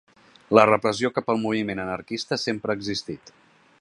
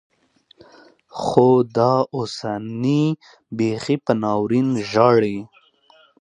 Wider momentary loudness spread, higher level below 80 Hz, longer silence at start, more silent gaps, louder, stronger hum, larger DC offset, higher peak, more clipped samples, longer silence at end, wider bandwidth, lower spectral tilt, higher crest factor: about the same, 13 LU vs 12 LU; about the same, -60 dBFS vs -60 dBFS; second, 0.5 s vs 1.15 s; neither; second, -23 LUFS vs -19 LUFS; neither; neither; about the same, 0 dBFS vs 0 dBFS; neither; about the same, 0.65 s vs 0.75 s; first, 11.5 kHz vs 10 kHz; second, -5 dB/octave vs -7 dB/octave; about the same, 24 dB vs 20 dB